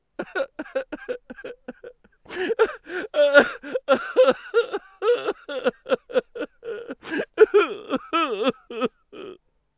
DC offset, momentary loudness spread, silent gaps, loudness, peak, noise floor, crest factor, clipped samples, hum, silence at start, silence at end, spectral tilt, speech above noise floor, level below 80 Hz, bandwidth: under 0.1%; 20 LU; none; -23 LUFS; 0 dBFS; -46 dBFS; 24 dB; under 0.1%; none; 0.2 s; 0.45 s; -7.5 dB/octave; 15 dB; -64 dBFS; 4 kHz